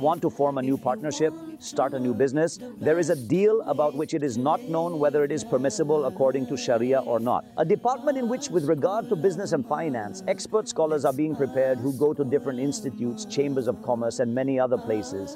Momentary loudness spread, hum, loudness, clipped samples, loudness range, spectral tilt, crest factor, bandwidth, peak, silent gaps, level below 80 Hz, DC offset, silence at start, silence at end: 5 LU; none; -25 LUFS; under 0.1%; 2 LU; -6 dB/octave; 14 dB; 16 kHz; -12 dBFS; none; -68 dBFS; under 0.1%; 0 s; 0 s